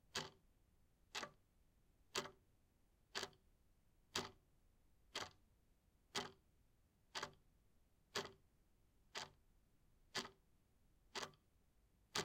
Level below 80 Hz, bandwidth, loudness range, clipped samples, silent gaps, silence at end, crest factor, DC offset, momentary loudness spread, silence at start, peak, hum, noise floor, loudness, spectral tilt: -78 dBFS; 16 kHz; 2 LU; under 0.1%; none; 0 s; 30 dB; under 0.1%; 9 LU; 0.15 s; -26 dBFS; none; -77 dBFS; -51 LUFS; -1.5 dB/octave